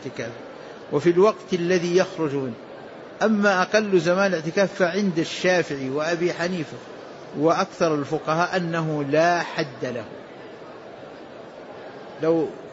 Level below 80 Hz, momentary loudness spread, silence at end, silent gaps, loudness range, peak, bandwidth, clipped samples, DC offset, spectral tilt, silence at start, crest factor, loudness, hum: -66 dBFS; 20 LU; 0 s; none; 5 LU; -6 dBFS; 8 kHz; under 0.1%; under 0.1%; -5.5 dB/octave; 0 s; 16 dB; -22 LUFS; none